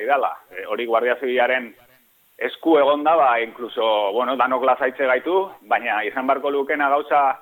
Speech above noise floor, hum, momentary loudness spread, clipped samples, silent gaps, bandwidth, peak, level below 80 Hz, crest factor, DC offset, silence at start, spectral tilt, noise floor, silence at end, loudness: 37 dB; none; 10 LU; under 0.1%; none; 17.5 kHz; -4 dBFS; -72 dBFS; 16 dB; under 0.1%; 0 s; -5 dB/octave; -57 dBFS; 0.05 s; -20 LUFS